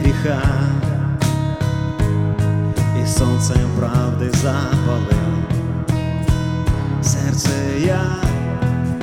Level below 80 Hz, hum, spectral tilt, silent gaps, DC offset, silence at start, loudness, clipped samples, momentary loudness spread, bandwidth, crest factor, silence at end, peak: -28 dBFS; none; -6 dB/octave; none; under 0.1%; 0 s; -18 LUFS; under 0.1%; 3 LU; 16 kHz; 16 dB; 0 s; -2 dBFS